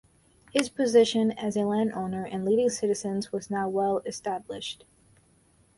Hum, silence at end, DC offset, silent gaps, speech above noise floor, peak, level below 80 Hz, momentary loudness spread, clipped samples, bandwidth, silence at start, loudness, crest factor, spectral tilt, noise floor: none; 1.05 s; under 0.1%; none; 36 dB; -8 dBFS; -64 dBFS; 12 LU; under 0.1%; 11.5 kHz; 0.55 s; -27 LUFS; 20 dB; -5 dB/octave; -63 dBFS